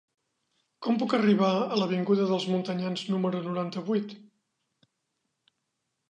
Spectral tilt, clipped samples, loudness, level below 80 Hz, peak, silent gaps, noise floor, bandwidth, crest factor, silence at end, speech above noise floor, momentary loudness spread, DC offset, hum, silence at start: -7 dB/octave; under 0.1%; -27 LUFS; -78 dBFS; -12 dBFS; none; -81 dBFS; 9.2 kHz; 18 dB; 1.9 s; 54 dB; 8 LU; under 0.1%; none; 0.8 s